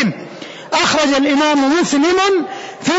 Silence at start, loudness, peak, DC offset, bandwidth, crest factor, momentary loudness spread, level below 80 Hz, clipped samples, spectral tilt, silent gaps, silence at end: 0 s; -14 LUFS; -4 dBFS; under 0.1%; 8 kHz; 10 dB; 15 LU; -52 dBFS; under 0.1%; -3.5 dB/octave; none; 0 s